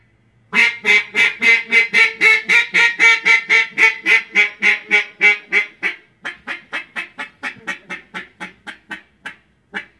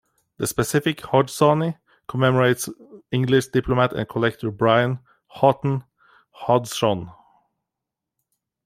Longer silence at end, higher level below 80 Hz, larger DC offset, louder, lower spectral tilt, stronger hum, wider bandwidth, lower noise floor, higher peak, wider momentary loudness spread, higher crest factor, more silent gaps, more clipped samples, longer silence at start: second, 0.15 s vs 1.55 s; second, -68 dBFS vs -52 dBFS; neither; first, -12 LUFS vs -21 LUFS; second, -1 dB/octave vs -5.5 dB/octave; neither; second, 12 kHz vs 16 kHz; second, -56 dBFS vs -85 dBFS; about the same, 0 dBFS vs -2 dBFS; first, 20 LU vs 11 LU; about the same, 18 dB vs 20 dB; neither; neither; about the same, 0.5 s vs 0.4 s